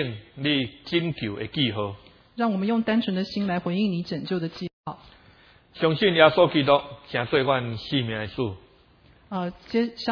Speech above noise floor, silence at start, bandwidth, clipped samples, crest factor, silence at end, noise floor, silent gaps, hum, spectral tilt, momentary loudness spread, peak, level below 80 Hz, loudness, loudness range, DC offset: 32 dB; 0 s; 5.4 kHz; under 0.1%; 24 dB; 0 s; -56 dBFS; 4.73-4.84 s; none; -7.5 dB/octave; 14 LU; 0 dBFS; -58 dBFS; -25 LUFS; 5 LU; under 0.1%